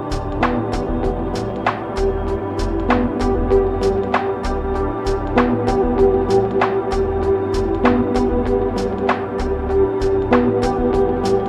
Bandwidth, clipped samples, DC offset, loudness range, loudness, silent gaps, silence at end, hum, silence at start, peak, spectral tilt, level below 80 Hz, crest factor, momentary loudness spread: 10.5 kHz; under 0.1%; under 0.1%; 2 LU; -19 LUFS; none; 0 s; none; 0 s; -2 dBFS; -7.5 dB/octave; -28 dBFS; 16 dB; 6 LU